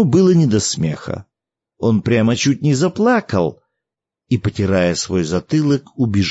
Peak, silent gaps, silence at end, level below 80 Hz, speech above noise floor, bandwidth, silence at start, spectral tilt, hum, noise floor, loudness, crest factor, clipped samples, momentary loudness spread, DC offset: -4 dBFS; none; 0 s; -48 dBFS; 68 dB; 8 kHz; 0 s; -6 dB/octave; none; -84 dBFS; -17 LUFS; 14 dB; under 0.1%; 8 LU; under 0.1%